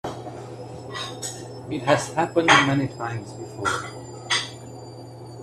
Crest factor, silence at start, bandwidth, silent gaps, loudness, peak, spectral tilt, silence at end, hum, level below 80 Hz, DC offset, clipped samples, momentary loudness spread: 24 dB; 0.05 s; 14 kHz; none; -23 LUFS; 0 dBFS; -4 dB/octave; 0 s; none; -58 dBFS; under 0.1%; under 0.1%; 23 LU